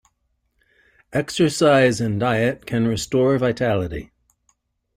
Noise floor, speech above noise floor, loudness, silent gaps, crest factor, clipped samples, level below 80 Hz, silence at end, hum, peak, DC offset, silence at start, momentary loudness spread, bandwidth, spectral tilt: -70 dBFS; 51 dB; -20 LUFS; none; 18 dB; under 0.1%; -48 dBFS; 0.9 s; none; -4 dBFS; under 0.1%; 1.1 s; 10 LU; 16 kHz; -5.5 dB/octave